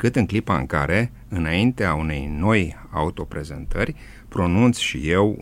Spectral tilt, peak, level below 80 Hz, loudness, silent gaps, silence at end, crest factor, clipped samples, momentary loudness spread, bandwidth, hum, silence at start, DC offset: -6 dB/octave; -4 dBFS; -34 dBFS; -22 LUFS; none; 0 s; 16 dB; under 0.1%; 12 LU; 15.5 kHz; none; 0 s; under 0.1%